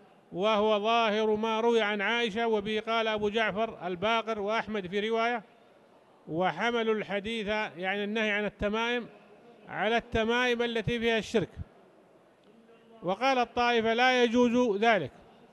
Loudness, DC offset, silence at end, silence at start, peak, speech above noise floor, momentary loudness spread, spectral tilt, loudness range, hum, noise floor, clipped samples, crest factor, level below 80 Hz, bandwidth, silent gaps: -28 LUFS; under 0.1%; 0.45 s; 0.3 s; -12 dBFS; 32 dB; 8 LU; -5 dB/octave; 4 LU; none; -60 dBFS; under 0.1%; 18 dB; -58 dBFS; 11.5 kHz; none